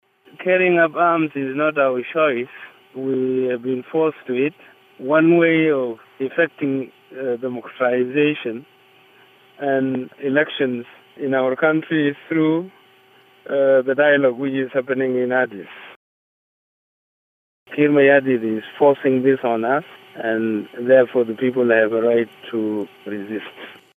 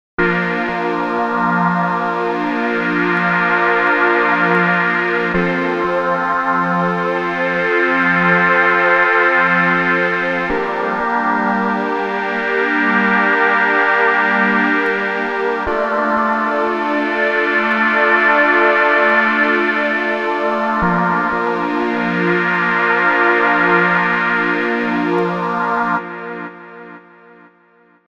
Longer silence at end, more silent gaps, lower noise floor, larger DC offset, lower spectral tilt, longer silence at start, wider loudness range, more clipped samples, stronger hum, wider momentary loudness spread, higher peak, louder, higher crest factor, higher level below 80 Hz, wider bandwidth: second, 0.25 s vs 1.1 s; first, 15.96-17.66 s vs none; about the same, -52 dBFS vs -52 dBFS; neither; first, -8.5 dB/octave vs -6.5 dB/octave; first, 0.4 s vs 0.2 s; about the same, 5 LU vs 3 LU; neither; neither; first, 14 LU vs 7 LU; about the same, -2 dBFS vs 0 dBFS; second, -19 LUFS vs -15 LUFS; about the same, 16 dB vs 16 dB; second, -76 dBFS vs -48 dBFS; first, 12.5 kHz vs 8.2 kHz